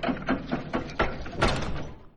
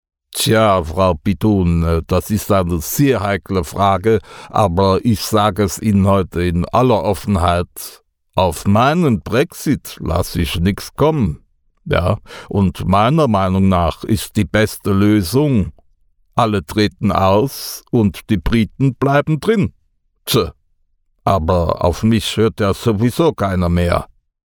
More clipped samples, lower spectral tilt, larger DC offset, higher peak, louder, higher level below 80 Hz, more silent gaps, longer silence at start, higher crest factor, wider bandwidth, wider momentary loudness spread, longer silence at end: neither; about the same, -5.5 dB/octave vs -6 dB/octave; neither; second, -10 dBFS vs 0 dBFS; second, -30 LUFS vs -16 LUFS; second, -38 dBFS vs -32 dBFS; neither; second, 0 s vs 0.3 s; about the same, 20 dB vs 16 dB; second, 11 kHz vs over 20 kHz; about the same, 7 LU vs 7 LU; second, 0.1 s vs 0.4 s